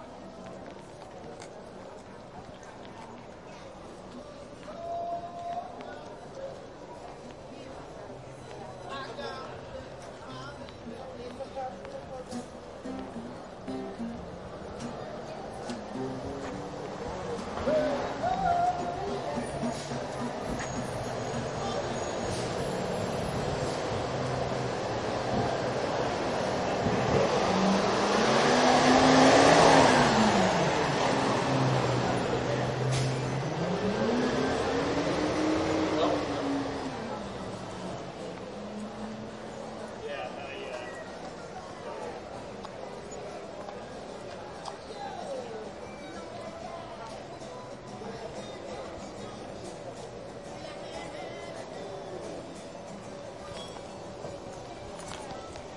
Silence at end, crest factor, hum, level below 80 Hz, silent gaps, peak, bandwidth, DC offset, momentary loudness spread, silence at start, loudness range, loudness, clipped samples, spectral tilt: 0 s; 24 dB; none; -54 dBFS; none; -6 dBFS; 11.5 kHz; under 0.1%; 18 LU; 0 s; 18 LU; -30 LUFS; under 0.1%; -5 dB/octave